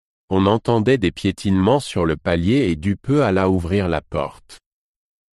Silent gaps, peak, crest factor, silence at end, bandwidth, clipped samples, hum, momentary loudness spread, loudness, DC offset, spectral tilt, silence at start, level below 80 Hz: none; -2 dBFS; 18 dB; 0.8 s; 12 kHz; under 0.1%; none; 6 LU; -19 LUFS; under 0.1%; -7 dB/octave; 0.3 s; -40 dBFS